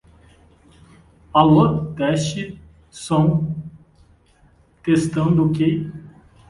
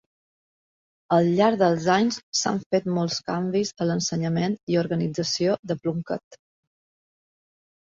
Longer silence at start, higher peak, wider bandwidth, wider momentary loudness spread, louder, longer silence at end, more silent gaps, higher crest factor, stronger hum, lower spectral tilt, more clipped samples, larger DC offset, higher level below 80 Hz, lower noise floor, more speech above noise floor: first, 1.35 s vs 1.1 s; first, 0 dBFS vs -6 dBFS; first, 11.5 kHz vs 7.8 kHz; first, 19 LU vs 8 LU; first, -19 LUFS vs -24 LUFS; second, 0.4 s vs 1.55 s; second, none vs 2.23-2.33 s, 2.66-2.70 s, 4.63-4.67 s, 5.59-5.63 s, 6.24-6.31 s; about the same, 20 dB vs 18 dB; neither; first, -7 dB/octave vs -5 dB/octave; neither; neither; first, -48 dBFS vs -64 dBFS; second, -55 dBFS vs under -90 dBFS; second, 37 dB vs over 67 dB